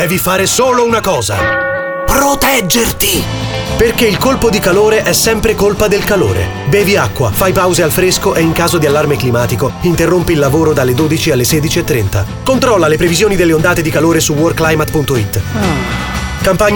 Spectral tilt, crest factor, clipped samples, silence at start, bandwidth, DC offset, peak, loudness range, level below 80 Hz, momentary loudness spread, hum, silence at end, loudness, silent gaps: -4.5 dB/octave; 10 dB; under 0.1%; 0 s; over 20 kHz; under 0.1%; 0 dBFS; 1 LU; -28 dBFS; 5 LU; none; 0 s; -11 LUFS; none